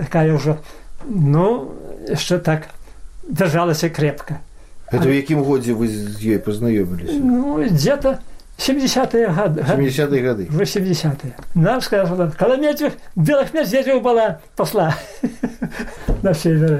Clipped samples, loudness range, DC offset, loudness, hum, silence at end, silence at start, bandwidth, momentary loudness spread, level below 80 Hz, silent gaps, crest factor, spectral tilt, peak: under 0.1%; 2 LU; under 0.1%; -18 LUFS; none; 0 s; 0 s; 16 kHz; 9 LU; -36 dBFS; none; 14 dB; -6.5 dB/octave; -4 dBFS